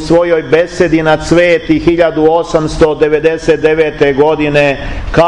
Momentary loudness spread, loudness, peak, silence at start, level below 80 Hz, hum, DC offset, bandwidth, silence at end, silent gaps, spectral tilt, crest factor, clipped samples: 3 LU; -10 LUFS; 0 dBFS; 0 s; -28 dBFS; none; 1%; 10.5 kHz; 0 s; none; -6 dB/octave; 10 dB; 0.1%